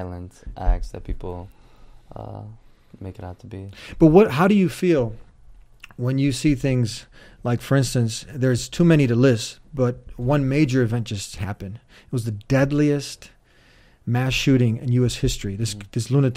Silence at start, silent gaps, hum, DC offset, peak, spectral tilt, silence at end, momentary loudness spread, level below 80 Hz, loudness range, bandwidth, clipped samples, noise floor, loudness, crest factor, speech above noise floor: 0 s; none; none; under 0.1%; -2 dBFS; -6.5 dB/octave; 0 s; 20 LU; -36 dBFS; 5 LU; 15.5 kHz; under 0.1%; -54 dBFS; -21 LUFS; 20 dB; 33 dB